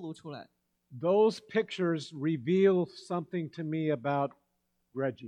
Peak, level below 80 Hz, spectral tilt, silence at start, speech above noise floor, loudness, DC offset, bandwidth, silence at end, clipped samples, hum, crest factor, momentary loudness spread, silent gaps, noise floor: -14 dBFS; -80 dBFS; -7 dB/octave; 0 s; 48 dB; -30 LUFS; under 0.1%; 10 kHz; 0 s; under 0.1%; none; 18 dB; 15 LU; none; -78 dBFS